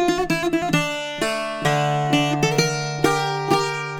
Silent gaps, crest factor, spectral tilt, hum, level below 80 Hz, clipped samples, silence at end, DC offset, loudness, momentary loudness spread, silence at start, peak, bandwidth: none; 20 dB; -4.5 dB/octave; none; -48 dBFS; under 0.1%; 0 s; under 0.1%; -21 LUFS; 4 LU; 0 s; 0 dBFS; 18 kHz